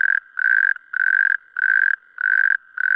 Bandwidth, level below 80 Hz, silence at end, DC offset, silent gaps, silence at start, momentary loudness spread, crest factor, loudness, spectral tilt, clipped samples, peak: 5.2 kHz; -74 dBFS; 0 s; under 0.1%; none; 0 s; 4 LU; 14 dB; -18 LUFS; 0.5 dB/octave; under 0.1%; -6 dBFS